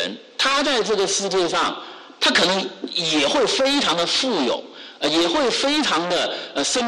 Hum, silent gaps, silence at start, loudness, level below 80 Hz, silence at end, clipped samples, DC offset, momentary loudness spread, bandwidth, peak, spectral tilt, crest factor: none; none; 0 s; -19 LUFS; -58 dBFS; 0 s; under 0.1%; under 0.1%; 7 LU; 13 kHz; -8 dBFS; -2 dB/octave; 12 dB